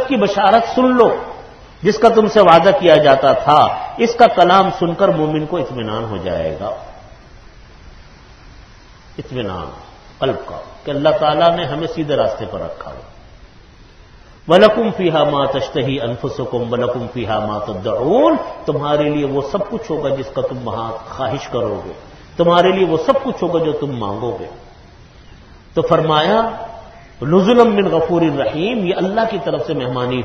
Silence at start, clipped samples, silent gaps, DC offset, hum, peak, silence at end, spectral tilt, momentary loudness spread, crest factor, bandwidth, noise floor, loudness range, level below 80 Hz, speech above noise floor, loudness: 0 s; under 0.1%; none; under 0.1%; none; 0 dBFS; 0 s; -6.5 dB/octave; 16 LU; 16 dB; 9 kHz; -42 dBFS; 12 LU; -44 dBFS; 27 dB; -15 LUFS